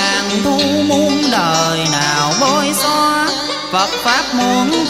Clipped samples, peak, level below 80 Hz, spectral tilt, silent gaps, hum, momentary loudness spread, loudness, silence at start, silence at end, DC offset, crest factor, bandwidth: under 0.1%; 0 dBFS; -46 dBFS; -3 dB/octave; none; none; 3 LU; -14 LUFS; 0 s; 0 s; 0.1%; 14 dB; 16 kHz